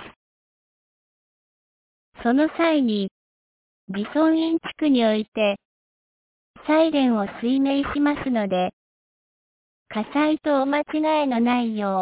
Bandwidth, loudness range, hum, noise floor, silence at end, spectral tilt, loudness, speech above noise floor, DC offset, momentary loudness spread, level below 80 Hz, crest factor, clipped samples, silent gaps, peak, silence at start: 4 kHz; 3 LU; none; under -90 dBFS; 0 s; -9.5 dB/octave; -22 LUFS; over 69 dB; under 0.1%; 9 LU; -58 dBFS; 14 dB; under 0.1%; 0.16-2.12 s, 3.11-3.87 s, 5.28-5.32 s, 5.65-6.54 s, 8.73-9.86 s; -8 dBFS; 0 s